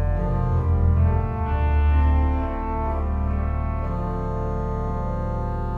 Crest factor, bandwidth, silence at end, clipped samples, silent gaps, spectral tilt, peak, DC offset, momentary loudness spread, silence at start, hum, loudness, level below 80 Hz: 12 dB; 3.5 kHz; 0 s; under 0.1%; none; -10.5 dB/octave; -10 dBFS; under 0.1%; 7 LU; 0 s; none; -24 LUFS; -24 dBFS